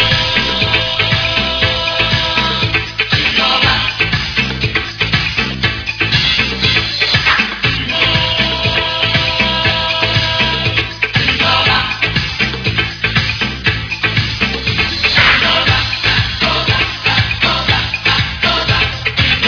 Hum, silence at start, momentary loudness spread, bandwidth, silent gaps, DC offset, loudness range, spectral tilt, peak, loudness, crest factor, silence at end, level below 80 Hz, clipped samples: none; 0 s; 5 LU; 5.4 kHz; none; under 0.1%; 2 LU; -4 dB/octave; 0 dBFS; -12 LUFS; 14 dB; 0 s; -30 dBFS; under 0.1%